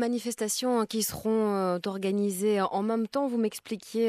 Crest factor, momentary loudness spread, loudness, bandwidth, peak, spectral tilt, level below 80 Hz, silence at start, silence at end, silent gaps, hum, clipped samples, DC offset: 14 dB; 4 LU; -29 LUFS; 14.5 kHz; -14 dBFS; -4.5 dB/octave; -66 dBFS; 0 s; 0 s; none; none; under 0.1%; under 0.1%